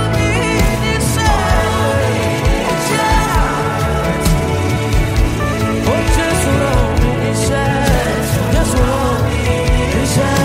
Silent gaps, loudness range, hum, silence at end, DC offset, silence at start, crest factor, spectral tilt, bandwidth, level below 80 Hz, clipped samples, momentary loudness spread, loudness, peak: none; 1 LU; none; 0 s; under 0.1%; 0 s; 14 dB; -5 dB/octave; 16 kHz; -20 dBFS; under 0.1%; 2 LU; -15 LUFS; 0 dBFS